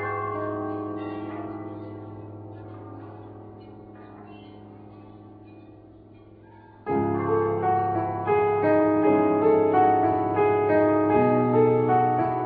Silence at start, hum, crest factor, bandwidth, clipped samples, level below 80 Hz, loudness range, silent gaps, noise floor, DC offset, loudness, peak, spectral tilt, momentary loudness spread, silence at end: 0 s; none; 16 dB; 4.5 kHz; under 0.1%; -60 dBFS; 23 LU; none; -49 dBFS; under 0.1%; -23 LUFS; -8 dBFS; -12 dB/octave; 24 LU; 0 s